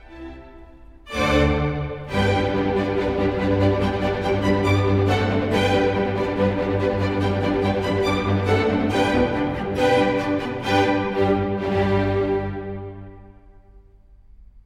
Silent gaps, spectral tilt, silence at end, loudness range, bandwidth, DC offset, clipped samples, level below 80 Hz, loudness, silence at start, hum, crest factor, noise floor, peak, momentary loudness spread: none; -7 dB/octave; 0.05 s; 3 LU; 12.5 kHz; under 0.1%; under 0.1%; -38 dBFS; -21 LUFS; 0.1 s; none; 16 dB; -49 dBFS; -6 dBFS; 6 LU